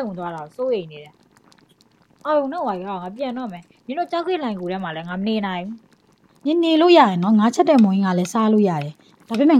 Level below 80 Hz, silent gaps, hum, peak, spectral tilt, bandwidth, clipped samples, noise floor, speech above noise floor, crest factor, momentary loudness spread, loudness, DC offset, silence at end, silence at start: -66 dBFS; none; none; -2 dBFS; -6.5 dB/octave; 12 kHz; under 0.1%; -56 dBFS; 37 dB; 18 dB; 16 LU; -20 LUFS; under 0.1%; 0 s; 0 s